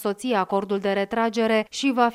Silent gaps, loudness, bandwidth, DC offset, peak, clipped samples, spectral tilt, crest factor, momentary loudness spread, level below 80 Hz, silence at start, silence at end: none; -23 LUFS; 15 kHz; under 0.1%; -6 dBFS; under 0.1%; -4.5 dB/octave; 16 dB; 3 LU; -64 dBFS; 0 s; 0 s